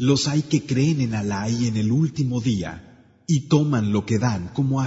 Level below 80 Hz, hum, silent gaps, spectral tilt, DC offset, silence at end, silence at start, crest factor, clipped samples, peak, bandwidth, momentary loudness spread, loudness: -52 dBFS; none; none; -6 dB/octave; under 0.1%; 0 s; 0 s; 16 dB; under 0.1%; -6 dBFS; 8 kHz; 6 LU; -22 LUFS